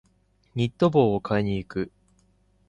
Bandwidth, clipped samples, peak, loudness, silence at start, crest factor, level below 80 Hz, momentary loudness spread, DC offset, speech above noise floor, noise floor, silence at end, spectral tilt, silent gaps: 9.6 kHz; under 0.1%; -6 dBFS; -24 LUFS; 0.55 s; 20 dB; -52 dBFS; 14 LU; under 0.1%; 41 dB; -65 dBFS; 0.8 s; -8 dB/octave; none